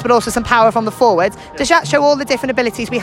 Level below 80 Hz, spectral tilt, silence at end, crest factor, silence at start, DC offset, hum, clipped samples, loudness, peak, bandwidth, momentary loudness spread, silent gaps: -40 dBFS; -4 dB/octave; 0 s; 14 dB; 0 s; under 0.1%; none; under 0.1%; -14 LUFS; 0 dBFS; 16.5 kHz; 6 LU; none